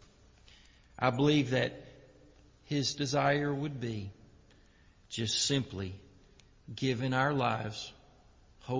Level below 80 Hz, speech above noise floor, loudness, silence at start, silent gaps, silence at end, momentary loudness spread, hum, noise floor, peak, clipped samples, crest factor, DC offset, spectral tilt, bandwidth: -60 dBFS; 30 dB; -32 LUFS; 1 s; none; 0 s; 16 LU; none; -62 dBFS; -14 dBFS; under 0.1%; 20 dB; under 0.1%; -4.5 dB/octave; 7.6 kHz